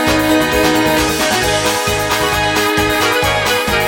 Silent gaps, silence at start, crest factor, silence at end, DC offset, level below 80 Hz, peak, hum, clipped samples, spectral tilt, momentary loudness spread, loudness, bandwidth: none; 0 s; 14 dB; 0 s; under 0.1%; -32 dBFS; 0 dBFS; none; under 0.1%; -3 dB/octave; 2 LU; -13 LUFS; 17 kHz